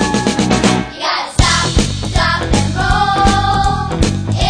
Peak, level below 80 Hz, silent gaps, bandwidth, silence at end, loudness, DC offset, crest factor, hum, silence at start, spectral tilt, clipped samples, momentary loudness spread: 0 dBFS; -22 dBFS; none; 10 kHz; 0 s; -14 LUFS; 0.1%; 14 dB; none; 0 s; -4.5 dB/octave; under 0.1%; 4 LU